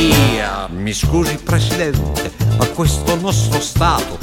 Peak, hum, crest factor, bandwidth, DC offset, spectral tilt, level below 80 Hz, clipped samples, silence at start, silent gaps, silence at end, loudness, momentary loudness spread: 0 dBFS; none; 16 dB; 17 kHz; under 0.1%; -5 dB/octave; -26 dBFS; under 0.1%; 0 s; none; 0 s; -16 LUFS; 5 LU